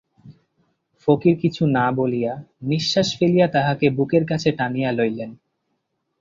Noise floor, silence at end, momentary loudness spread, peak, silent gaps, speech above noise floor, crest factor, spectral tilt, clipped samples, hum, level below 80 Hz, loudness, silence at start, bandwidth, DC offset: -74 dBFS; 0.85 s; 8 LU; -2 dBFS; none; 54 dB; 18 dB; -6.5 dB/octave; under 0.1%; none; -58 dBFS; -20 LUFS; 0.25 s; 7.6 kHz; under 0.1%